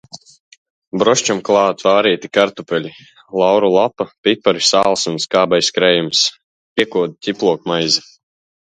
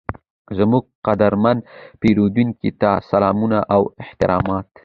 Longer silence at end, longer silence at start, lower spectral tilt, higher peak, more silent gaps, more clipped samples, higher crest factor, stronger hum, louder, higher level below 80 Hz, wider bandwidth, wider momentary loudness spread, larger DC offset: first, 0.65 s vs 0.2 s; about the same, 0.15 s vs 0.1 s; second, -3 dB/octave vs -9.5 dB/octave; about the same, 0 dBFS vs -2 dBFS; first, 0.40-0.51 s, 0.57-0.91 s, 4.18-4.24 s, 6.44-6.76 s vs 0.30-0.45 s, 0.95-1.02 s; neither; about the same, 16 dB vs 16 dB; neither; first, -15 LUFS vs -18 LUFS; second, -60 dBFS vs -42 dBFS; first, 10 kHz vs 6.8 kHz; about the same, 8 LU vs 8 LU; neither